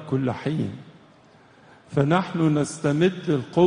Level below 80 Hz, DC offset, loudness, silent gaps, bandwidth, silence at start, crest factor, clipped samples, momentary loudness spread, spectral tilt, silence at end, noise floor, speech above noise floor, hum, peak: -60 dBFS; under 0.1%; -24 LUFS; none; 10 kHz; 0 s; 18 dB; under 0.1%; 8 LU; -7 dB/octave; 0 s; -53 dBFS; 31 dB; none; -6 dBFS